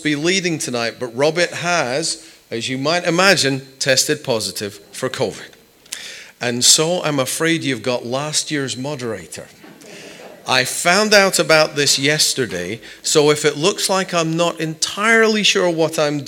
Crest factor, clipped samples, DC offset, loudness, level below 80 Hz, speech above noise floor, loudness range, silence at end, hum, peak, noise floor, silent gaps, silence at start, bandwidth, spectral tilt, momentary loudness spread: 18 dB; under 0.1%; under 0.1%; -16 LUFS; -62 dBFS; 21 dB; 6 LU; 0 s; none; 0 dBFS; -38 dBFS; none; 0 s; 18.5 kHz; -2.5 dB/octave; 16 LU